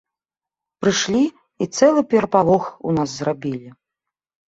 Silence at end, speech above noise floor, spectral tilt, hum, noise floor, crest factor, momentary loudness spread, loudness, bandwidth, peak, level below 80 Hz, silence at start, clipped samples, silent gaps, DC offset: 0.8 s; 71 dB; -5 dB/octave; none; -89 dBFS; 18 dB; 11 LU; -19 LUFS; 8.2 kHz; -2 dBFS; -56 dBFS; 0.8 s; under 0.1%; none; under 0.1%